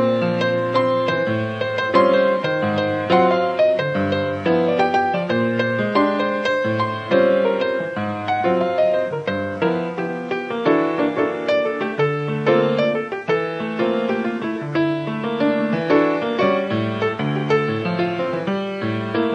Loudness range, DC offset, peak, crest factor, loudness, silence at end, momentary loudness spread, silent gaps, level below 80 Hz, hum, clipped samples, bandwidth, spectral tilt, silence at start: 3 LU; under 0.1%; -4 dBFS; 16 dB; -20 LUFS; 0 s; 7 LU; none; -64 dBFS; none; under 0.1%; 8.8 kHz; -7.5 dB/octave; 0 s